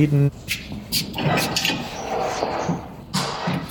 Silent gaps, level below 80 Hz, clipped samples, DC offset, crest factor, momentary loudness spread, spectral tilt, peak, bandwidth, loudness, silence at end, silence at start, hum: none; -46 dBFS; under 0.1%; under 0.1%; 18 dB; 8 LU; -4.5 dB/octave; -6 dBFS; 18 kHz; -23 LUFS; 0 s; 0 s; none